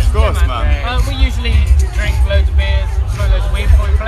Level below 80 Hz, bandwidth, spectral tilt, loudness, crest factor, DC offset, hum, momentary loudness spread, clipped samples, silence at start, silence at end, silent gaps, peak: -12 dBFS; 12 kHz; -5.5 dB/octave; -15 LUFS; 12 dB; under 0.1%; none; 4 LU; under 0.1%; 0 s; 0 s; none; 0 dBFS